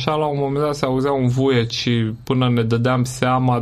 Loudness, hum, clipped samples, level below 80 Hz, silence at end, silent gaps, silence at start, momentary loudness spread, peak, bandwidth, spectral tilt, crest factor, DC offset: -19 LUFS; none; under 0.1%; -46 dBFS; 0 s; none; 0 s; 3 LU; -2 dBFS; 13 kHz; -6.5 dB/octave; 16 dB; under 0.1%